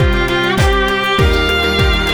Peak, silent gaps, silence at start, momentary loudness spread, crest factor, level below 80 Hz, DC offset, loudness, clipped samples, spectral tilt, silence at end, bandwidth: -2 dBFS; none; 0 s; 1 LU; 12 dB; -18 dBFS; under 0.1%; -13 LUFS; under 0.1%; -5 dB/octave; 0 s; over 20 kHz